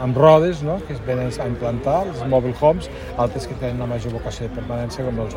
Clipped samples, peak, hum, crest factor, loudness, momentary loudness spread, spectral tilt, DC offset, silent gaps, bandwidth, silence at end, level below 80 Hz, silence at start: under 0.1%; 0 dBFS; none; 20 dB; -21 LUFS; 13 LU; -7.5 dB/octave; under 0.1%; none; 16 kHz; 0 s; -36 dBFS; 0 s